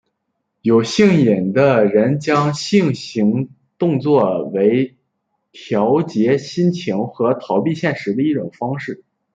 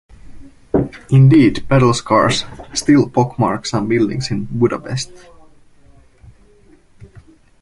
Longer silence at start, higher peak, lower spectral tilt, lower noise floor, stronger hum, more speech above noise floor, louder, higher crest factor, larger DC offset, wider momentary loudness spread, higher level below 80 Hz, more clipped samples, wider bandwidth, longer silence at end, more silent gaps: first, 0.65 s vs 0.25 s; about the same, -2 dBFS vs -2 dBFS; about the same, -7 dB/octave vs -6 dB/octave; first, -73 dBFS vs -48 dBFS; neither; first, 57 dB vs 33 dB; about the same, -17 LUFS vs -15 LUFS; about the same, 14 dB vs 16 dB; neither; about the same, 10 LU vs 12 LU; second, -60 dBFS vs -42 dBFS; neither; second, 9 kHz vs 11.5 kHz; second, 0.4 s vs 2.45 s; neither